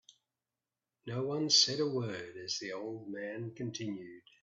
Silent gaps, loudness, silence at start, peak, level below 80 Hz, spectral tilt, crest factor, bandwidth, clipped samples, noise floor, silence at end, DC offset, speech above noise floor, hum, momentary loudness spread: none; -33 LUFS; 1.05 s; -14 dBFS; -78 dBFS; -3 dB/octave; 24 dB; 8 kHz; under 0.1%; under -90 dBFS; 0.25 s; under 0.1%; over 54 dB; none; 17 LU